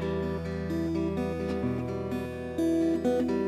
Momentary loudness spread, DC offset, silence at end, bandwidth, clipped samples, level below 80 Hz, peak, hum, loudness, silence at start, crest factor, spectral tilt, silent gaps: 7 LU; under 0.1%; 0 s; 13.5 kHz; under 0.1%; -48 dBFS; -16 dBFS; none; -30 LUFS; 0 s; 14 dB; -8 dB/octave; none